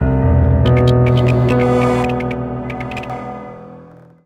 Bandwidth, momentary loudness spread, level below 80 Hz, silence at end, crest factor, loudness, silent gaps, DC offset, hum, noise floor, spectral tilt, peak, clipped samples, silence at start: 9.2 kHz; 16 LU; -26 dBFS; 0.4 s; 12 dB; -15 LUFS; none; under 0.1%; none; -40 dBFS; -8.5 dB/octave; -2 dBFS; under 0.1%; 0 s